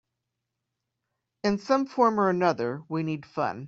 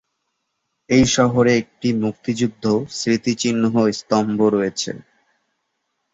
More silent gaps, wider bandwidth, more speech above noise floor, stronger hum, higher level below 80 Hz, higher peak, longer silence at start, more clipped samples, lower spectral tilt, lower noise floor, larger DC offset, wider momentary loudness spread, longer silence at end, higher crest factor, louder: neither; about the same, 7.8 kHz vs 8 kHz; about the same, 58 dB vs 56 dB; neither; second, -70 dBFS vs -50 dBFS; second, -8 dBFS vs -4 dBFS; first, 1.45 s vs 0.9 s; neither; first, -6.5 dB/octave vs -5 dB/octave; first, -84 dBFS vs -74 dBFS; neither; about the same, 9 LU vs 8 LU; second, 0 s vs 1.1 s; about the same, 20 dB vs 16 dB; second, -26 LUFS vs -19 LUFS